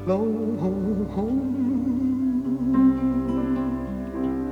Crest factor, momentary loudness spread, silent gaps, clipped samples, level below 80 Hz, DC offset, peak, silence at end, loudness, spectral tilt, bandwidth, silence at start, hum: 14 dB; 8 LU; none; under 0.1%; -42 dBFS; under 0.1%; -10 dBFS; 0 s; -24 LUFS; -9.5 dB/octave; 4.9 kHz; 0 s; none